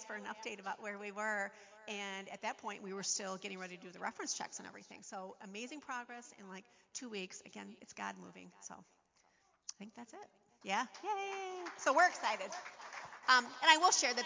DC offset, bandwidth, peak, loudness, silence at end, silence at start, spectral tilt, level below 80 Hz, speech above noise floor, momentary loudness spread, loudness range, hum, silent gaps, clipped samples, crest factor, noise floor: under 0.1%; 7.8 kHz; -10 dBFS; -37 LUFS; 0 s; 0 s; -1 dB/octave; -90 dBFS; 35 dB; 22 LU; 14 LU; none; none; under 0.1%; 28 dB; -74 dBFS